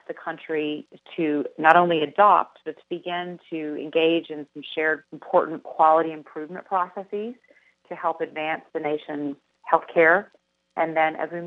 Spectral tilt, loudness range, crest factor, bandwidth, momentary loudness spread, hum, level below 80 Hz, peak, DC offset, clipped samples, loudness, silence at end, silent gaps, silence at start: -7 dB/octave; 7 LU; 24 dB; 5.8 kHz; 18 LU; none; -84 dBFS; 0 dBFS; under 0.1%; under 0.1%; -23 LUFS; 0 s; none; 0.1 s